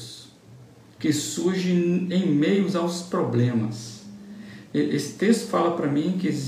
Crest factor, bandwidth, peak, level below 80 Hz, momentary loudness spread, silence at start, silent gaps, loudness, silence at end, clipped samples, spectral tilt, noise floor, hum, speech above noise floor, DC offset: 18 dB; 15 kHz; -6 dBFS; -68 dBFS; 19 LU; 0 s; none; -24 LUFS; 0 s; under 0.1%; -6 dB/octave; -48 dBFS; none; 25 dB; under 0.1%